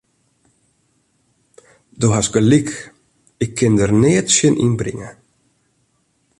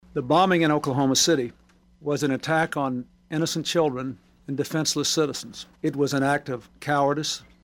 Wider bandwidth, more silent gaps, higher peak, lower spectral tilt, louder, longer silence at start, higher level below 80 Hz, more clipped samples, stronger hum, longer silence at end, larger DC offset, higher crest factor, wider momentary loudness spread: second, 11.5 kHz vs 18 kHz; neither; first, -2 dBFS vs -8 dBFS; about the same, -5 dB/octave vs -4 dB/octave; first, -16 LUFS vs -24 LUFS; first, 2 s vs 0.15 s; first, -46 dBFS vs -58 dBFS; neither; neither; first, 1.3 s vs 0.25 s; neither; about the same, 18 dB vs 16 dB; about the same, 14 LU vs 14 LU